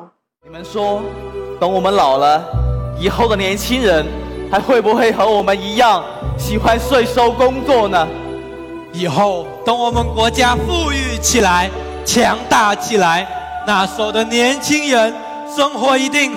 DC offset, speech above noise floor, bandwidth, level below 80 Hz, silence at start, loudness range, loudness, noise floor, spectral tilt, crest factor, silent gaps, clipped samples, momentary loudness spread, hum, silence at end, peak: under 0.1%; 29 dB; 17 kHz; -30 dBFS; 0 s; 2 LU; -15 LUFS; -43 dBFS; -4 dB/octave; 12 dB; none; under 0.1%; 11 LU; none; 0 s; -2 dBFS